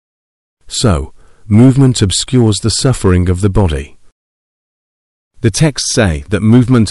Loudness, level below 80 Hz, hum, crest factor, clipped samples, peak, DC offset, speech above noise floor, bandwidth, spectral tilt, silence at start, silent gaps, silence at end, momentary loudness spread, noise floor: -11 LUFS; -28 dBFS; none; 12 dB; under 0.1%; 0 dBFS; under 0.1%; over 80 dB; 12 kHz; -5.5 dB/octave; 0.65 s; 4.12-5.31 s; 0 s; 8 LU; under -90 dBFS